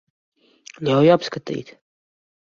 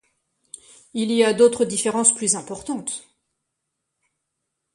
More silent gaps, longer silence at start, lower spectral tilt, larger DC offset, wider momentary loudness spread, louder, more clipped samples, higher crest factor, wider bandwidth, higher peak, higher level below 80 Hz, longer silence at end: neither; second, 0.8 s vs 0.95 s; first, -6.5 dB/octave vs -2.5 dB/octave; neither; about the same, 15 LU vs 14 LU; about the same, -19 LUFS vs -20 LUFS; neither; about the same, 20 dB vs 22 dB; second, 7.4 kHz vs 11.5 kHz; about the same, -2 dBFS vs -2 dBFS; about the same, -62 dBFS vs -64 dBFS; second, 0.8 s vs 1.75 s